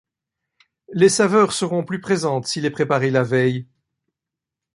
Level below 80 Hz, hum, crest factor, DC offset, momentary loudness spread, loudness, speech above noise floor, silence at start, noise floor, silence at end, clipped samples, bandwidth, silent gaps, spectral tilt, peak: -62 dBFS; none; 18 dB; under 0.1%; 8 LU; -19 LUFS; 67 dB; 0.9 s; -86 dBFS; 1.1 s; under 0.1%; 11.5 kHz; none; -5 dB/octave; -2 dBFS